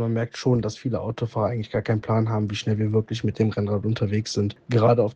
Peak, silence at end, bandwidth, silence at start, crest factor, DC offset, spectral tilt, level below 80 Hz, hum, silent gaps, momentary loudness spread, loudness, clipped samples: -6 dBFS; 0 s; 8.2 kHz; 0 s; 16 dB; under 0.1%; -7 dB/octave; -56 dBFS; none; none; 6 LU; -24 LUFS; under 0.1%